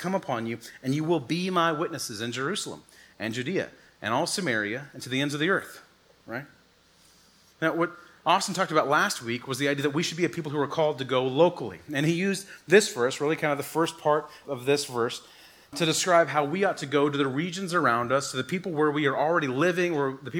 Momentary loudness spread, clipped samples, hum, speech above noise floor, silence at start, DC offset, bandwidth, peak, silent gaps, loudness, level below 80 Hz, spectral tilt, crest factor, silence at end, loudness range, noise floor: 10 LU; under 0.1%; none; 34 dB; 0 s; under 0.1%; 19.5 kHz; -6 dBFS; none; -26 LUFS; -72 dBFS; -4.5 dB/octave; 22 dB; 0 s; 5 LU; -60 dBFS